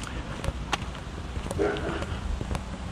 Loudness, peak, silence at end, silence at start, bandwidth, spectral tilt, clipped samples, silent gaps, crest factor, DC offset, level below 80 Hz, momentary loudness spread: -32 LUFS; -12 dBFS; 0 s; 0 s; 15 kHz; -5.5 dB/octave; under 0.1%; none; 20 dB; under 0.1%; -36 dBFS; 8 LU